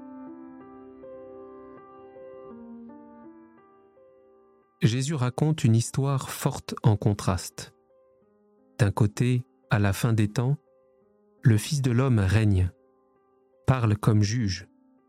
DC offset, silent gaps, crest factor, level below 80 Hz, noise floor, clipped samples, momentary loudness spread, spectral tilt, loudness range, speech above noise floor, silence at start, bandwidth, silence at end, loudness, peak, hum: under 0.1%; none; 18 dB; -54 dBFS; -64 dBFS; under 0.1%; 23 LU; -6.5 dB/octave; 20 LU; 40 dB; 0 s; 15.5 kHz; 0.45 s; -25 LUFS; -8 dBFS; none